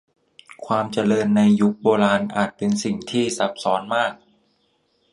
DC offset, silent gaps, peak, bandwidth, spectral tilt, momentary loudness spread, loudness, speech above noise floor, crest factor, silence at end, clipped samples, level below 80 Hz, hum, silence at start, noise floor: under 0.1%; none; -2 dBFS; 11.5 kHz; -5.5 dB/octave; 7 LU; -20 LUFS; 46 dB; 18 dB; 1 s; under 0.1%; -62 dBFS; none; 0.6 s; -66 dBFS